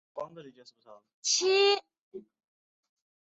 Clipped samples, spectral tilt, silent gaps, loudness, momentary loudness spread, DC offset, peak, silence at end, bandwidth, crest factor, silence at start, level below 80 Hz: under 0.1%; -0.5 dB/octave; 1.14-1.23 s, 2.01-2.11 s; -26 LUFS; 26 LU; under 0.1%; -14 dBFS; 1.15 s; 8.2 kHz; 20 dB; 0.15 s; -80 dBFS